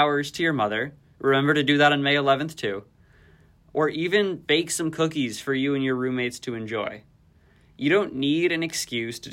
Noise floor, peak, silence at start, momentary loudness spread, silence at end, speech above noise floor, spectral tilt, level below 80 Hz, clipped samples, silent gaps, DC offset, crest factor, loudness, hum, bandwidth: -57 dBFS; -6 dBFS; 0 s; 10 LU; 0 s; 34 dB; -4.5 dB/octave; -62 dBFS; under 0.1%; none; under 0.1%; 18 dB; -24 LUFS; none; 16 kHz